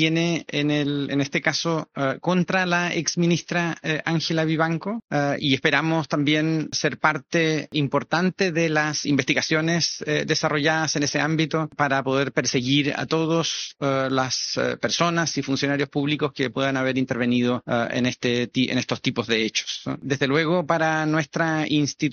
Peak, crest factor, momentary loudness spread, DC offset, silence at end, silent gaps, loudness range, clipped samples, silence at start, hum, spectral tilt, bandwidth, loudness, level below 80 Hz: -2 dBFS; 20 dB; 4 LU; under 0.1%; 0 s; none; 1 LU; under 0.1%; 0 s; none; -4 dB/octave; 7 kHz; -23 LUFS; -62 dBFS